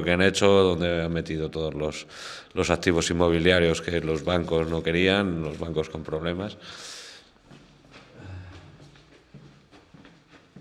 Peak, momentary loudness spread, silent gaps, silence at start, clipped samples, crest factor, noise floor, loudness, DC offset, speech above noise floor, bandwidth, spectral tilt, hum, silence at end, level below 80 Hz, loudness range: -4 dBFS; 20 LU; none; 0 s; under 0.1%; 22 dB; -54 dBFS; -24 LUFS; under 0.1%; 30 dB; 12.5 kHz; -5 dB/octave; none; 0 s; -50 dBFS; 15 LU